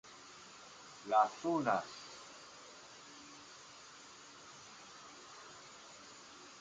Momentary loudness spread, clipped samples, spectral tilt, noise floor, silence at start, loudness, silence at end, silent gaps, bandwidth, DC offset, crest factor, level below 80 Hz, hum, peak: 19 LU; under 0.1%; -3.5 dB/octave; -56 dBFS; 0.05 s; -36 LUFS; 0 s; none; 9.4 kHz; under 0.1%; 26 dB; -82 dBFS; none; -18 dBFS